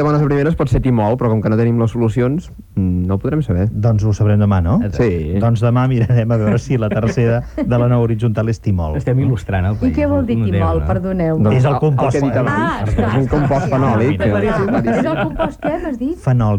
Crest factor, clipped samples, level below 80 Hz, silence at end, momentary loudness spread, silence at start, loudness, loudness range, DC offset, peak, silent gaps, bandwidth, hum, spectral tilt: 12 dB; under 0.1%; -30 dBFS; 0 s; 4 LU; 0 s; -16 LUFS; 1 LU; under 0.1%; -2 dBFS; none; 9 kHz; none; -8.5 dB/octave